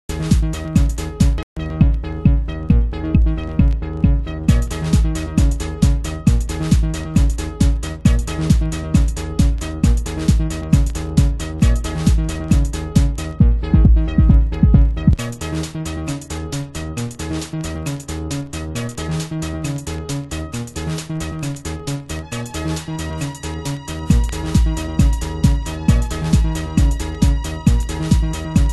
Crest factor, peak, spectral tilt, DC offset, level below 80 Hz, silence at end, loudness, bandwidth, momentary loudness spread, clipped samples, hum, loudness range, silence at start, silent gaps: 16 dB; 0 dBFS; -6.5 dB/octave; under 0.1%; -20 dBFS; 0 s; -19 LUFS; 12.5 kHz; 9 LU; under 0.1%; none; 9 LU; 0.1 s; 1.43-1.56 s